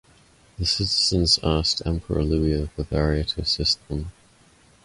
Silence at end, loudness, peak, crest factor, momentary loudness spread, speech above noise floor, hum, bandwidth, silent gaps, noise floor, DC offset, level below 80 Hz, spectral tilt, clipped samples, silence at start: 0.75 s; -22 LUFS; -6 dBFS; 18 dB; 8 LU; 33 dB; none; 11.5 kHz; none; -56 dBFS; under 0.1%; -34 dBFS; -4.5 dB/octave; under 0.1%; 0.6 s